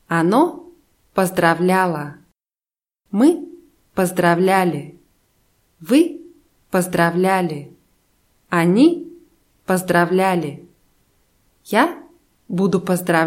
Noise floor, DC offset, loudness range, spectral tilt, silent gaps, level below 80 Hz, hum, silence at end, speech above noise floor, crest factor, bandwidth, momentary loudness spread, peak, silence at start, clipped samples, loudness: under -90 dBFS; under 0.1%; 2 LU; -6 dB/octave; none; -60 dBFS; none; 0 s; over 73 dB; 18 dB; 16.5 kHz; 15 LU; -2 dBFS; 0.1 s; under 0.1%; -18 LUFS